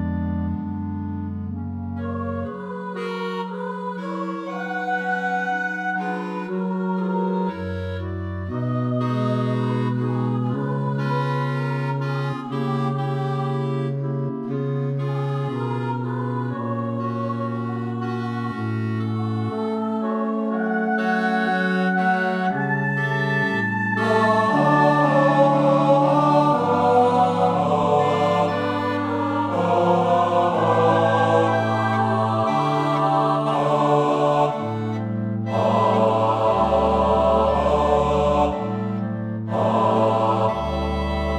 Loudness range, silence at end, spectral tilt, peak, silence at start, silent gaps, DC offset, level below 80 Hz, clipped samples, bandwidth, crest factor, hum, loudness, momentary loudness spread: 8 LU; 0 s; -7.5 dB/octave; -4 dBFS; 0 s; none; under 0.1%; -42 dBFS; under 0.1%; 10 kHz; 16 dB; none; -22 LUFS; 10 LU